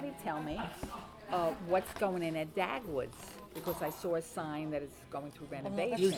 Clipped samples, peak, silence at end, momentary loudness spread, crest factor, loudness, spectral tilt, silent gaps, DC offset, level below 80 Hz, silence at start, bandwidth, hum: under 0.1%; -18 dBFS; 0 s; 11 LU; 20 dB; -38 LUFS; -5.5 dB/octave; none; under 0.1%; -60 dBFS; 0 s; over 20 kHz; none